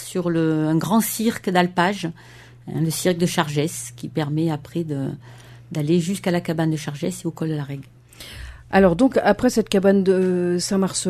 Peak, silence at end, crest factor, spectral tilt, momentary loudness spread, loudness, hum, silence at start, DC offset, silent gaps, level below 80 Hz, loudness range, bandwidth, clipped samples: 0 dBFS; 0 s; 20 dB; -5.5 dB/octave; 14 LU; -21 LUFS; none; 0 s; under 0.1%; none; -48 dBFS; 5 LU; 13.5 kHz; under 0.1%